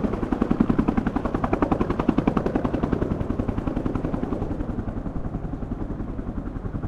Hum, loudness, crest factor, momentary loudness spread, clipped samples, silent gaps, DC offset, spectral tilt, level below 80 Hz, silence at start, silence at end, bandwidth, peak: none; -26 LUFS; 20 dB; 9 LU; under 0.1%; none; under 0.1%; -9.5 dB/octave; -32 dBFS; 0 s; 0 s; 8.2 kHz; -4 dBFS